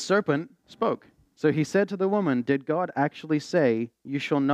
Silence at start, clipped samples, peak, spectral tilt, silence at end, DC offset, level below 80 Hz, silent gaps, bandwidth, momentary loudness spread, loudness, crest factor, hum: 0 s; under 0.1%; -10 dBFS; -6.5 dB/octave; 0 s; under 0.1%; -74 dBFS; none; 11 kHz; 6 LU; -26 LUFS; 16 dB; none